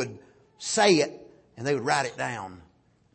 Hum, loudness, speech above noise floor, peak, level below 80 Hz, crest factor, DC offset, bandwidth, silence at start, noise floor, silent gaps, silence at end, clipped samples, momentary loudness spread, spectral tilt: none; -26 LUFS; 24 dB; -8 dBFS; -68 dBFS; 20 dB; under 0.1%; 8.8 kHz; 0 s; -49 dBFS; none; 0.55 s; under 0.1%; 16 LU; -3.5 dB/octave